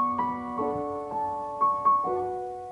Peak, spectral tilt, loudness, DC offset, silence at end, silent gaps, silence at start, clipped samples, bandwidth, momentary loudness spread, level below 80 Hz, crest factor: -14 dBFS; -8 dB/octave; -28 LUFS; under 0.1%; 0 s; none; 0 s; under 0.1%; 10.5 kHz; 8 LU; -58 dBFS; 14 dB